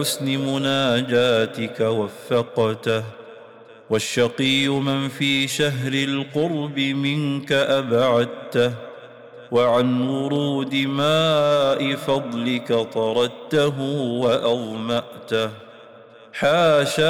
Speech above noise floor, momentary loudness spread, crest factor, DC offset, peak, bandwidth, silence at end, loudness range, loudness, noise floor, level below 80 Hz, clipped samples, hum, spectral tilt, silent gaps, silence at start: 25 dB; 7 LU; 12 dB; under 0.1%; -8 dBFS; 18 kHz; 0 s; 2 LU; -21 LUFS; -45 dBFS; -62 dBFS; under 0.1%; none; -5 dB/octave; none; 0 s